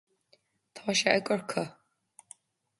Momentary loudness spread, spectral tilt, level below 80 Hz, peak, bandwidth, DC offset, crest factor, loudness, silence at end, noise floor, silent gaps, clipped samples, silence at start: 26 LU; -3 dB/octave; -76 dBFS; -6 dBFS; 11.5 kHz; under 0.1%; 28 dB; -29 LUFS; 1.1 s; -69 dBFS; none; under 0.1%; 0.75 s